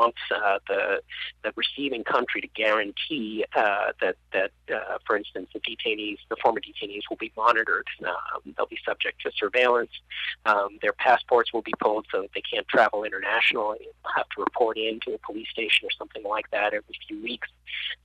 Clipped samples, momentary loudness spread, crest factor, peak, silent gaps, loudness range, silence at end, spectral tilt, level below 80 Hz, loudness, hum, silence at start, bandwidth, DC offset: under 0.1%; 11 LU; 20 dB; -8 dBFS; none; 3 LU; 0.1 s; -4 dB/octave; -62 dBFS; -26 LUFS; none; 0 s; 10 kHz; under 0.1%